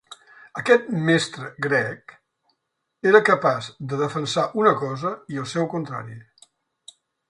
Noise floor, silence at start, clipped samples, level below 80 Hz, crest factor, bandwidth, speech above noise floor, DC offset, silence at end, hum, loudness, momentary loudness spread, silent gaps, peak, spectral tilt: -77 dBFS; 0.1 s; under 0.1%; -66 dBFS; 22 dB; 11 kHz; 55 dB; under 0.1%; 1.1 s; none; -22 LUFS; 14 LU; none; 0 dBFS; -5.5 dB/octave